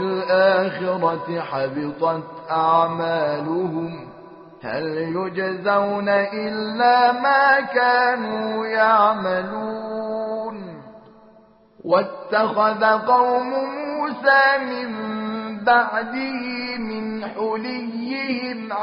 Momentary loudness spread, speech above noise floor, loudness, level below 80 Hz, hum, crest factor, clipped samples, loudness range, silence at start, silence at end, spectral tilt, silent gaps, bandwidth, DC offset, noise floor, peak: 12 LU; 32 dB; -20 LUFS; -64 dBFS; none; 18 dB; under 0.1%; 6 LU; 0 s; 0 s; -2.5 dB/octave; none; 5.6 kHz; under 0.1%; -52 dBFS; -4 dBFS